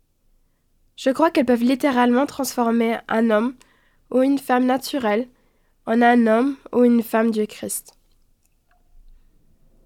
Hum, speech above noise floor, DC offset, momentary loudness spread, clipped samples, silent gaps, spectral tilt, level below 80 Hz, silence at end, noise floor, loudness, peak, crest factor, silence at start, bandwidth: none; 44 dB; under 0.1%; 9 LU; under 0.1%; none; -4.5 dB/octave; -58 dBFS; 2.05 s; -62 dBFS; -20 LUFS; -4 dBFS; 16 dB; 1 s; 16.5 kHz